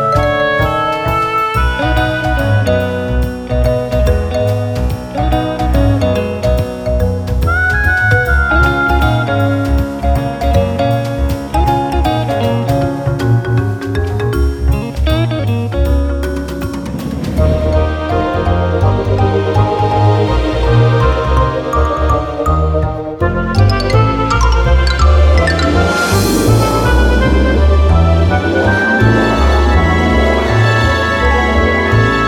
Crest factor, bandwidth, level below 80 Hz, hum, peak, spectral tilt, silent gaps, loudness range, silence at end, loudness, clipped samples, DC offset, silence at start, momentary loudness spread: 12 dB; 17 kHz; -18 dBFS; none; 0 dBFS; -6.5 dB/octave; none; 4 LU; 0 s; -13 LUFS; under 0.1%; under 0.1%; 0 s; 6 LU